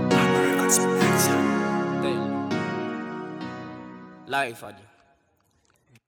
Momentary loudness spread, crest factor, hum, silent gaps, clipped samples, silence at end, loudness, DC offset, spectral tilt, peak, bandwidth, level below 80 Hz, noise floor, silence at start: 20 LU; 20 dB; none; none; under 0.1%; 1.3 s; -24 LUFS; under 0.1%; -4 dB/octave; -6 dBFS; over 20 kHz; -70 dBFS; -67 dBFS; 0 s